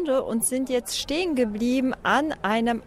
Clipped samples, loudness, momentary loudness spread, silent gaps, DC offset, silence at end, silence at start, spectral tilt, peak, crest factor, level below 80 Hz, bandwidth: under 0.1%; -24 LUFS; 3 LU; none; under 0.1%; 0 s; 0 s; -3 dB/octave; -10 dBFS; 14 dB; -50 dBFS; 16 kHz